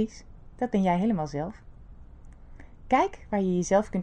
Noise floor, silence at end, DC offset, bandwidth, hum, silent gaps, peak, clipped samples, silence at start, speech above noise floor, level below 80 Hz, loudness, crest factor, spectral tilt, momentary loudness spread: -47 dBFS; 0 s; under 0.1%; 9.2 kHz; none; none; -10 dBFS; under 0.1%; 0 s; 21 dB; -48 dBFS; -27 LUFS; 18 dB; -6.5 dB/octave; 9 LU